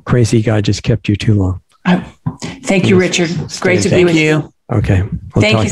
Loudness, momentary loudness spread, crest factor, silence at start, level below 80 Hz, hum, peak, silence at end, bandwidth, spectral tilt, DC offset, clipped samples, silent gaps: -13 LUFS; 9 LU; 12 dB; 0.05 s; -36 dBFS; none; 0 dBFS; 0 s; 12 kHz; -6 dB/octave; 0.3%; under 0.1%; none